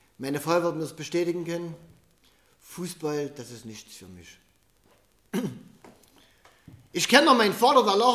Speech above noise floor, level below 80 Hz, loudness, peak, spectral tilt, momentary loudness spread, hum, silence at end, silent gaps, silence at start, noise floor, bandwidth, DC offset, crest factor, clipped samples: 39 dB; -68 dBFS; -24 LUFS; -2 dBFS; -3.5 dB/octave; 23 LU; none; 0 s; none; 0.2 s; -64 dBFS; 15.5 kHz; under 0.1%; 26 dB; under 0.1%